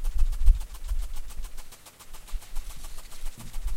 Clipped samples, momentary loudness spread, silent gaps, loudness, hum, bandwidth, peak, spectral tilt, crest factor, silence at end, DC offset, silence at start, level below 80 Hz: under 0.1%; 19 LU; none; -35 LUFS; none; 15.5 kHz; -6 dBFS; -4 dB/octave; 20 dB; 0 s; under 0.1%; 0 s; -28 dBFS